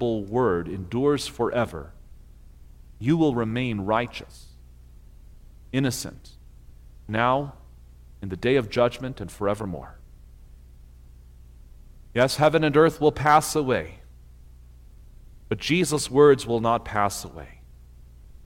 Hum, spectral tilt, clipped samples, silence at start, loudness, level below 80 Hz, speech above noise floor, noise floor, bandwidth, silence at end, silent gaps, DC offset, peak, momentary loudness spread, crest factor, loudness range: 60 Hz at -50 dBFS; -5.5 dB/octave; under 0.1%; 0 s; -23 LUFS; -46 dBFS; 24 dB; -47 dBFS; 16.5 kHz; 0 s; none; under 0.1%; -4 dBFS; 19 LU; 20 dB; 8 LU